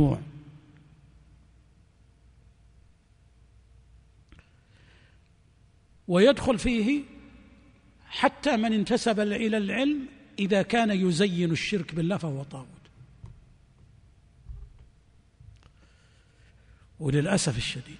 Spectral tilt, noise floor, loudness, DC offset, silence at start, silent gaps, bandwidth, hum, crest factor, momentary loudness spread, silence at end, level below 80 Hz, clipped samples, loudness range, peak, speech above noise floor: -5.5 dB/octave; -60 dBFS; -26 LUFS; under 0.1%; 0 s; none; 10.5 kHz; none; 22 dB; 22 LU; 0 s; -52 dBFS; under 0.1%; 10 LU; -6 dBFS; 35 dB